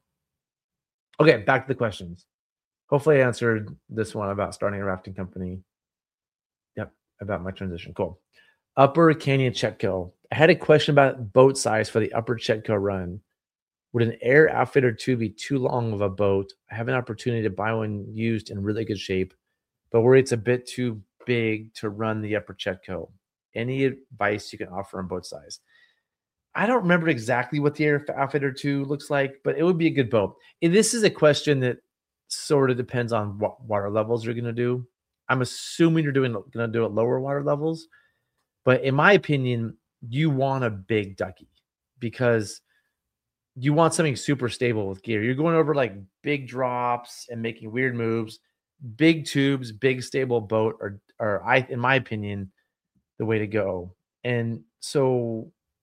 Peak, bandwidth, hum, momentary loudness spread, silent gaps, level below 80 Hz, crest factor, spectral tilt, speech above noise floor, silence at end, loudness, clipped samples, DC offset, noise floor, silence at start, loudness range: 0 dBFS; 15.5 kHz; none; 15 LU; 2.34-2.56 s, 2.65-2.71 s, 2.84-2.88 s, 6.46-6.50 s, 13.62-13.67 s, 23.45-23.53 s; -64 dBFS; 24 dB; -6 dB/octave; over 67 dB; 0.4 s; -24 LUFS; under 0.1%; under 0.1%; under -90 dBFS; 1.2 s; 7 LU